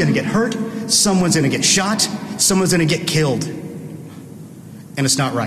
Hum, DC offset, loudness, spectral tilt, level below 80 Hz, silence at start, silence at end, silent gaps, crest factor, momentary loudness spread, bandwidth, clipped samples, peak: none; under 0.1%; -16 LUFS; -3.5 dB/octave; -48 dBFS; 0 s; 0 s; none; 14 dB; 22 LU; 14 kHz; under 0.1%; -4 dBFS